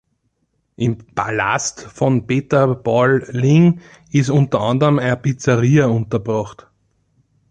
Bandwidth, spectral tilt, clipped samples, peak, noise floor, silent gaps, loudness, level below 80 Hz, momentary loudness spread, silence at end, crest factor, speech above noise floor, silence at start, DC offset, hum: 9 kHz; -6.5 dB/octave; under 0.1%; -2 dBFS; -68 dBFS; none; -17 LUFS; -50 dBFS; 9 LU; 1 s; 14 dB; 51 dB; 0.8 s; under 0.1%; none